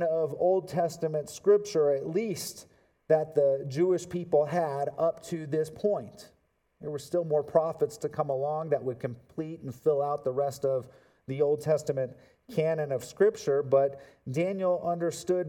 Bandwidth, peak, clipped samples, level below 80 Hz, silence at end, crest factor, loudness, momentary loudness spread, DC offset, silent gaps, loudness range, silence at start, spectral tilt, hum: 17 kHz; -10 dBFS; under 0.1%; -72 dBFS; 0 s; 20 dB; -29 LUFS; 12 LU; under 0.1%; none; 3 LU; 0 s; -6.5 dB/octave; none